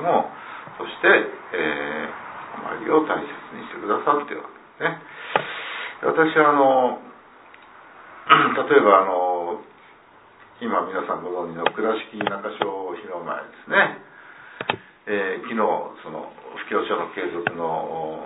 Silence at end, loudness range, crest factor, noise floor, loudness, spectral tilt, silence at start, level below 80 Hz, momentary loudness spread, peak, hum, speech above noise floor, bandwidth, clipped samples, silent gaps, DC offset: 0 s; 7 LU; 22 dB; -50 dBFS; -22 LUFS; -8.5 dB/octave; 0 s; -68 dBFS; 19 LU; 0 dBFS; none; 29 dB; 4 kHz; under 0.1%; none; under 0.1%